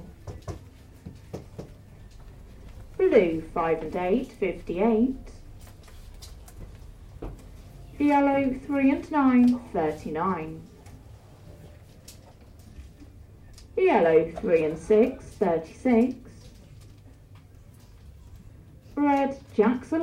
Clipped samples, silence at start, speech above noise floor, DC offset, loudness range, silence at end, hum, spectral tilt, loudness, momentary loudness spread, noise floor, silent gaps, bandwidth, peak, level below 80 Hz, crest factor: under 0.1%; 0 s; 26 dB; under 0.1%; 10 LU; 0 s; none; -7.5 dB/octave; -24 LUFS; 25 LU; -50 dBFS; none; 13.5 kHz; -6 dBFS; -48 dBFS; 22 dB